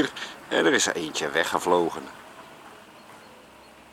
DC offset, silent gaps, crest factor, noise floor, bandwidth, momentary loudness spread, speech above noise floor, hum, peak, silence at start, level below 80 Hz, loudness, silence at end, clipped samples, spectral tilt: under 0.1%; none; 22 dB; -50 dBFS; 17 kHz; 24 LU; 25 dB; none; -6 dBFS; 0 s; -68 dBFS; -24 LUFS; 0.5 s; under 0.1%; -2.5 dB/octave